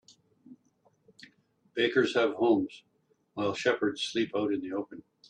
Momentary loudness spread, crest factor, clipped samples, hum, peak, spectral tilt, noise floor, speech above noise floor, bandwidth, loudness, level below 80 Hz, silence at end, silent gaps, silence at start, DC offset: 13 LU; 18 dB; under 0.1%; none; -12 dBFS; -4.5 dB/octave; -69 dBFS; 40 dB; 10 kHz; -29 LUFS; -76 dBFS; 0.3 s; none; 0.5 s; under 0.1%